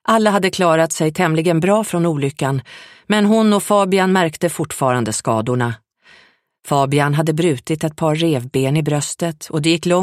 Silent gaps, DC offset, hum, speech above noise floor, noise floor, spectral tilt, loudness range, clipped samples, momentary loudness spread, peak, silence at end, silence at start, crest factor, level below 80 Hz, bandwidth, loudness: none; under 0.1%; none; 36 dB; -53 dBFS; -5.5 dB/octave; 3 LU; under 0.1%; 7 LU; -2 dBFS; 0 s; 0.05 s; 14 dB; -56 dBFS; 15.5 kHz; -17 LUFS